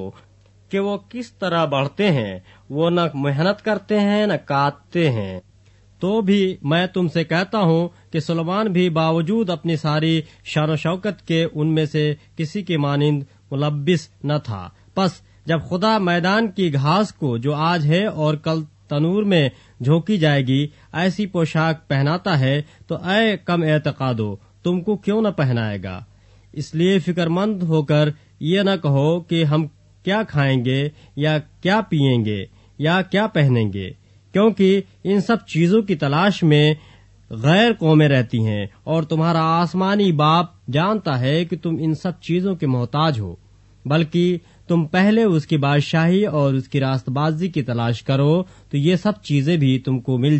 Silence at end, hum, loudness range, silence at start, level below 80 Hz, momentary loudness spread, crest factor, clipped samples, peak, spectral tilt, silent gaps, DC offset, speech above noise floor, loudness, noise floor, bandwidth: 0 s; none; 4 LU; 0 s; -54 dBFS; 9 LU; 16 dB; under 0.1%; -4 dBFS; -7.5 dB/octave; none; under 0.1%; 33 dB; -20 LUFS; -51 dBFS; 8.4 kHz